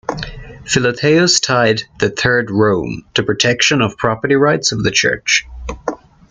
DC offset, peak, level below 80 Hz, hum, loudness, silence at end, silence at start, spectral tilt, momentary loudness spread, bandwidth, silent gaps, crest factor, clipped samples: under 0.1%; 0 dBFS; -40 dBFS; none; -14 LUFS; 0.35 s; 0.1 s; -3.5 dB/octave; 14 LU; 10 kHz; none; 16 dB; under 0.1%